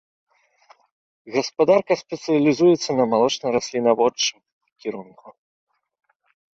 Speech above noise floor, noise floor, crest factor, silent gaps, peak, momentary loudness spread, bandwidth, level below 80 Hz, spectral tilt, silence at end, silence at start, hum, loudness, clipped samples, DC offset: 36 dB; -56 dBFS; 18 dB; 4.52-4.61 s; -4 dBFS; 15 LU; 7.8 kHz; -66 dBFS; -4.5 dB/octave; 1.25 s; 1.25 s; none; -20 LUFS; under 0.1%; under 0.1%